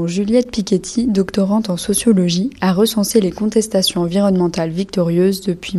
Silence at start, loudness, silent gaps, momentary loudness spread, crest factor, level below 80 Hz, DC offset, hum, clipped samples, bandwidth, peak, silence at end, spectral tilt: 0 s; -16 LUFS; none; 4 LU; 14 dB; -44 dBFS; under 0.1%; none; under 0.1%; 13.5 kHz; -2 dBFS; 0 s; -5.5 dB/octave